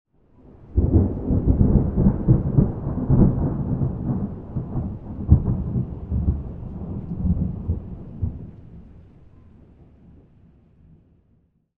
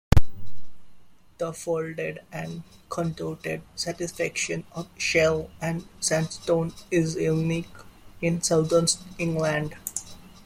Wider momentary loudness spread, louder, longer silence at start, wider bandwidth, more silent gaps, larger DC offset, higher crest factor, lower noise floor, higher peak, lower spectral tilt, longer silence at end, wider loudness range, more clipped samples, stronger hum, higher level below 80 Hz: about the same, 14 LU vs 13 LU; first, -23 LUFS vs -27 LUFS; first, 0.6 s vs 0.1 s; second, 2.1 kHz vs 16.5 kHz; neither; neither; about the same, 22 dB vs 22 dB; first, -62 dBFS vs -49 dBFS; about the same, 0 dBFS vs -2 dBFS; first, -14.5 dB/octave vs -4.5 dB/octave; first, 2.8 s vs 0.15 s; first, 13 LU vs 7 LU; neither; neither; first, -28 dBFS vs -38 dBFS